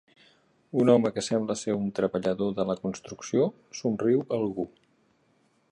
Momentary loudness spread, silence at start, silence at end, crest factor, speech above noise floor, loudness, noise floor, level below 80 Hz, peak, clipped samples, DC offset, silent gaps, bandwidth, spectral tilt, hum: 11 LU; 0.75 s; 1.05 s; 20 dB; 41 dB; -27 LUFS; -67 dBFS; -64 dBFS; -8 dBFS; under 0.1%; under 0.1%; none; 11 kHz; -6 dB/octave; none